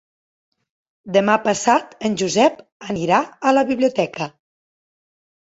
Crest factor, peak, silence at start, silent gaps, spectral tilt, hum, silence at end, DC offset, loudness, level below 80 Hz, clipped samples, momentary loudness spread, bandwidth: 18 dB; -2 dBFS; 1.05 s; 2.72-2.80 s; -4.5 dB/octave; none; 1.2 s; under 0.1%; -18 LUFS; -62 dBFS; under 0.1%; 10 LU; 8 kHz